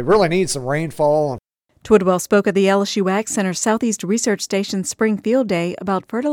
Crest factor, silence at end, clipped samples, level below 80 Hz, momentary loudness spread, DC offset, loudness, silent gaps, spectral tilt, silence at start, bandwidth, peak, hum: 16 dB; 0 s; under 0.1%; -50 dBFS; 7 LU; under 0.1%; -18 LUFS; none; -4.5 dB/octave; 0 s; 17 kHz; -2 dBFS; none